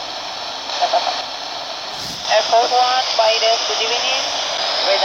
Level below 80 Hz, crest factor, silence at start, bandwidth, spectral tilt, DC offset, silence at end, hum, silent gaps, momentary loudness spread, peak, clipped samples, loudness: -60 dBFS; 16 dB; 0 s; 16.5 kHz; 0 dB/octave; under 0.1%; 0 s; none; none; 11 LU; -2 dBFS; under 0.1%; -17 LUFS